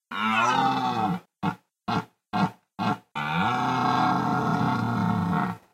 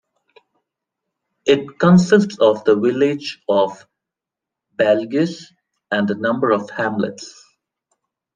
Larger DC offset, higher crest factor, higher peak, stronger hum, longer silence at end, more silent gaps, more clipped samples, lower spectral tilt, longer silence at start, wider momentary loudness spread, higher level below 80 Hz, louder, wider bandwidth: neither; about the same, 14 dB vs 18 dB; second, -12 dBFS vs -2 dBFS; neither; second, 0.15 s vs 1.05 s; neither; neither; about the same, -6 dB/octave vs -6.5 dB/octave; second, 0.1 s vs 1.45 s; second, 8 LU vs 12 LU; about the same, -60 dBFS vs -58 dBFS; second, -26 LUFS vs -17 LUFS; first, 15.5 kHz vs 9.2 kHz